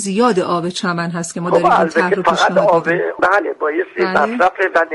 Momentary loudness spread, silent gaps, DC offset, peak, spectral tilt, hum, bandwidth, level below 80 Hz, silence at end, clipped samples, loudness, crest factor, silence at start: 6 LU; none; under 0.1%; -2 dBFS; -5 dB/octave; none; 11.5 kHz; -54 dBFS; 0 s; under 0.1%; -15 LUFS; 12 dB; 0 s